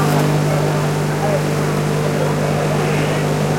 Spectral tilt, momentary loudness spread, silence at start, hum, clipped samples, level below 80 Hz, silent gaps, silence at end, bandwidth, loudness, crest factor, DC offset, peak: -6 dB/octave; 2 LU; 0 s; 50 Hz at -20 dBFS; under 0.1%; -40 dBFS; none; 0 s; 16.5 kHz; -17 LUFS; 12 dB; under 0.1%; -4 dBFS